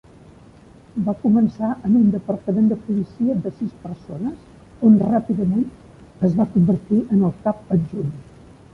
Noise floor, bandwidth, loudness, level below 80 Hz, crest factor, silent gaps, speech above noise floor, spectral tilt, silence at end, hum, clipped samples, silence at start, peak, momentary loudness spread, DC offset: -46 dBFS; 3 kHz; -20 LUFS; -50 dBFS; 16 dB; none; 27 dB; -11 dB/octave; 0.5 s; none; under 0.1%; 0.95 s; -4 dBFS; 13 LU; under 0.1%